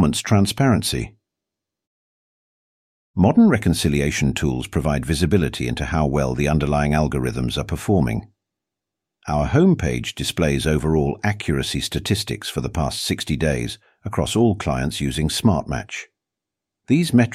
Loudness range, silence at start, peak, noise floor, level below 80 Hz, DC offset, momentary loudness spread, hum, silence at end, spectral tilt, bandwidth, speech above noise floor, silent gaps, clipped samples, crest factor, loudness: 3 LU; 0 s; -4 dBFS; -85 dBFS; -34 dBFS; under 0.1%; 9 LU; none; 0 s; -5.5 dB/octave; 16 kHz; 65 dB; 1.87-3.14 s; under 0.1%; 16 dB; -20 LUFS